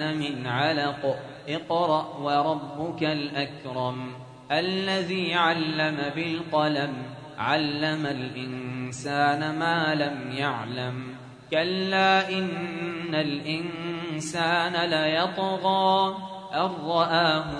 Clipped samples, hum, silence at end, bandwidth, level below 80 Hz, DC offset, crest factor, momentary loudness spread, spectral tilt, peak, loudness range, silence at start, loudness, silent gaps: under 0.1%; none; 0 s; 10.5 kHz; -64 dBFS; under 0.1%; 18 dB; 11 LU; -5 dB/octave; -8 dBFS; 3 LU; 0 s; -26 LUFS; none